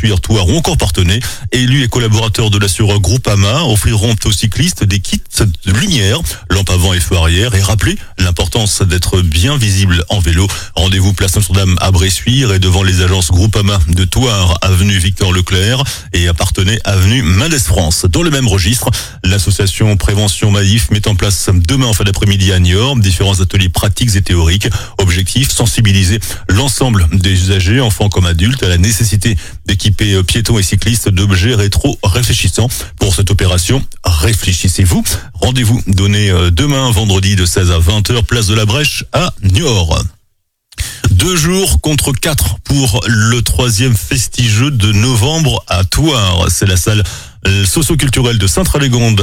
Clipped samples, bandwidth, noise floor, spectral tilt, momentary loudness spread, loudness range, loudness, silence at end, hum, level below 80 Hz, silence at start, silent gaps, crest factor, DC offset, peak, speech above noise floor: under 0.1%; 16.5 kHz; -59 dBFS; -4.5 dB/octave; 4 LU; 1 LU; -11 LUFS; 0 s; none; -22 dBFS; 0 s; none; 10 dB; under 0.1%; 0 dBFS; 49 dB